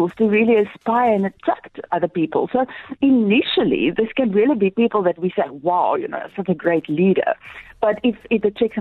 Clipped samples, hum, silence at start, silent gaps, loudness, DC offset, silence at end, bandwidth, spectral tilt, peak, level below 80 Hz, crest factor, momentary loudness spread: under 0.1%; none; 0 s; none; -19 LUFS; under 0.1%; 0 s; 4.4 kHz; -8.5 dB/octave; -6 dBFS; -56 dBFS; 12 dB; 8 LU